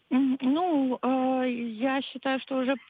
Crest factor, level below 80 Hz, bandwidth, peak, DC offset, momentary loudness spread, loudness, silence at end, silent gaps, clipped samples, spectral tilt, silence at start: 12 dB; -84 dBFS; 4.7 kHz; -14 dBFS; under 0.1%; 5 LU; -27 LUFS; 0.1 s; none; under 0.1%; -7.5 dB/octave; 0.1 s